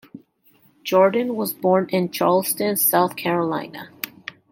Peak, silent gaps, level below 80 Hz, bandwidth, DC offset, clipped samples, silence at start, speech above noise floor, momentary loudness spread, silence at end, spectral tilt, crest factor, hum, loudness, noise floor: -4 dBFS; none; -70 dBFS; 17 kHz; under 0.1%; under 0.1%; 0.15 s; 38 dB; 15 LU; 0.4 s; -4.5 dB/octave; 18 dB; none; -20 LUFS; -58 dBFS